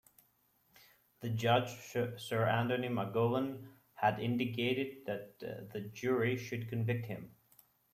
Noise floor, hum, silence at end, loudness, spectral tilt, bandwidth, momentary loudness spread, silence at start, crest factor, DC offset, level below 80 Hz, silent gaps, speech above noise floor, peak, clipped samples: -73 dBFS; none; 0.65 s; -36 LUFS; -6.5 dB/octave; 15.5 kHz; 13 LU; 1.2 s; 20 dB; under 0.1%; -72 dBFS; none; 38 dB; -16 dBFS; under 0.1%